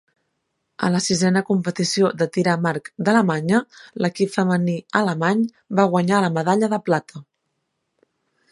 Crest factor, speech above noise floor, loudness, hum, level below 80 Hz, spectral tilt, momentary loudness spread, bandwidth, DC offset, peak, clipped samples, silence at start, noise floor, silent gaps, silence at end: 20 dB; 55 dB; -20 LUFS; none; -66 dBFS; -5.5 dB/octave; 5 LU; 11.5 kHz; under 0.1%; -2 dBFS; under 0.1%; 0.8 s; -75 dBFS; none; 1.3 s